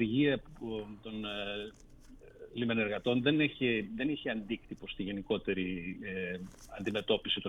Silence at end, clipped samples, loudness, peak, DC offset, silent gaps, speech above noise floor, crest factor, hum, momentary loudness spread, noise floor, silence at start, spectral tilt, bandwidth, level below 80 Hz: 0 s; under 0.1%; -35 LUFS; -16 dBFS; under 0.1%; none; 20 dB; 20 dB; none; 13 LU; -54 dBFS; 0 s; -6.5 dB/octave; 11 kHz; -58 dBFS